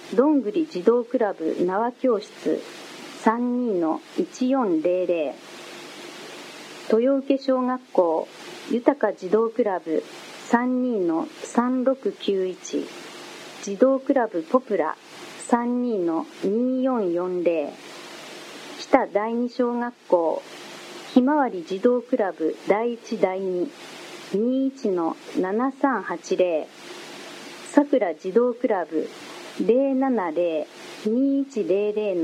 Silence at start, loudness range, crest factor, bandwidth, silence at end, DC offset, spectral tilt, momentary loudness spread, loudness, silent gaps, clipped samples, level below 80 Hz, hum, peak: 0 s; 2 LU; 24 dB; 13 kHz; 0 s; under 0.1%; -5.5 dB/octave; 17 LU; -24 LUFS; none; under 0.1%; -74 dBFS; none; 0 dBFS